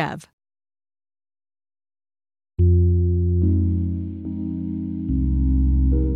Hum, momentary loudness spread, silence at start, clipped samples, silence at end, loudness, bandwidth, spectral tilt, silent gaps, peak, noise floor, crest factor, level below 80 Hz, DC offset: none; 11 LU; 0 s; under 0.1%; 0 s; -21 LUFS; 4.2 kHz; -10 dB/octave; 0.33-0.38 s; -8 dBFS; under -90 dBFS; 12 dB; -26 dBFS; under 0.1%